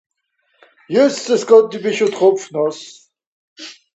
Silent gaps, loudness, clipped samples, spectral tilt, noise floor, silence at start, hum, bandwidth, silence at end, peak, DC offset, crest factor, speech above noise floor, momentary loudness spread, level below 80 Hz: 3.27-3.56 s; -15 LUFS; under 0.1%; -4.5 dB/octave; -65 dBFS; 0.9 s; none; 8.2 kHz; 0.25 s; 0 dBFS; under 0.1%; 16 dB; 51 dB; 23 LU; -70 dBFS